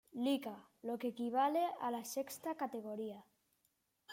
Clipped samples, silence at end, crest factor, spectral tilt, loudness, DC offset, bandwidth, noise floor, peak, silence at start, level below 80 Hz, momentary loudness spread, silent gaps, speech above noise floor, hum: under 0.1%; 0 s; 16 dB; -4 dB/octave; -40 LUFS; under 0.1%; 16.5 kHz; -81 dBFS; -24 dBFS; 0.15 s; -88 dBFS; 13 LU; none; 42 dB; none